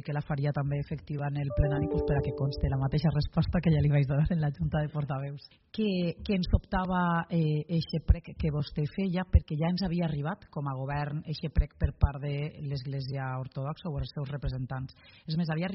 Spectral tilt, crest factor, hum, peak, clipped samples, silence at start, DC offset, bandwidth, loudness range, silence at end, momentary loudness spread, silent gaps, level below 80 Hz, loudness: -7 dB/octave; 20 dB; none; -10 dBFS; under 0.1%; 0.05 s; under 0.1%; 5.8 kHz; 5 LU; 0 s; 9 LU; none; -38 dBFS; -31 LUFS